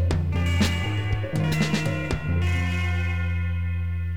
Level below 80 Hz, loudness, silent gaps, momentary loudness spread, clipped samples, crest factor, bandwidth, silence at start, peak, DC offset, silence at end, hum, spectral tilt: -34 dBFS; -25 LUFS; none; 4 LU; under 0.1%; 14 dB; 14 kHz; 0 s; -10 dBFS; 1%; 0 s; none; -6 dB/octave